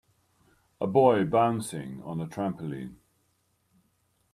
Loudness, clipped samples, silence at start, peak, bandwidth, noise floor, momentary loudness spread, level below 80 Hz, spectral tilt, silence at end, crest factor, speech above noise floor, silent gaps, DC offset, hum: -27 LUFS; under 0.1%; 0.8 s; -8 dBFS; 15 kHz; -72 dBFS; 16 LU; -66 dBFS; -7 dB/octave; 1.4 s; 22 dB; 45 dB; none; under 0.1%; none